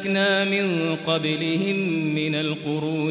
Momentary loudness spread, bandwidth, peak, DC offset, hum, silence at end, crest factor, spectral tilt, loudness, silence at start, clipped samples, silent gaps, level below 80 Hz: 5 LU; 4 kHz; -8 dBFS; under 0.1%; none; 0 s; 14 dB; -10 dB/octave; -23 LUFS; 0 s; under 0.1%; none; -68 dBFS